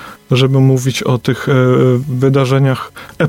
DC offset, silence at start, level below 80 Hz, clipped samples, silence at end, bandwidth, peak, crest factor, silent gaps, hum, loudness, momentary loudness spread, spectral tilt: under 0.1%; 0 s; -48 dBFS; under 0.1%; 0 s; 15 kHz; 0 dBFS; 12 dB; none; none; -13 LUFS; 6 LU; -6.5 dB/octave